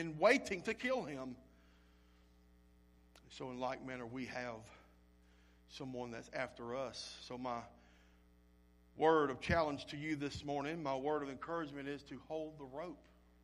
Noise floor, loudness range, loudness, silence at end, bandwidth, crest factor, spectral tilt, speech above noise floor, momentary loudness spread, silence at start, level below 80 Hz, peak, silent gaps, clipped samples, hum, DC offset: -67 dBFS; 10 LU; -40 LUFS; 0.45 s; 13 kHz; 24 dB; -5 dB/octave; 27 dB; 18 LU; 0 s; -64 dBFS; -18 dBFS; none; under 0.1%; 60 Hz at -65 dBFS; under 0.1%